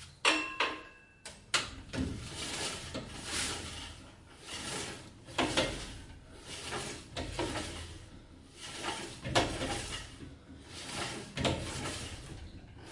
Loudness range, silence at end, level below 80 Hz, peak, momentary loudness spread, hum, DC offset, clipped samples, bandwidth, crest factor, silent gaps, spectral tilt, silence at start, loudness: 3 LU; 0 s; -52 dBFS; -14 dBFS; 20 LU; none; under 0.1%; under 0.1%; 11.5 kHz; 26 dB; none; -3 dB/octave; 0 s; -36 LUFS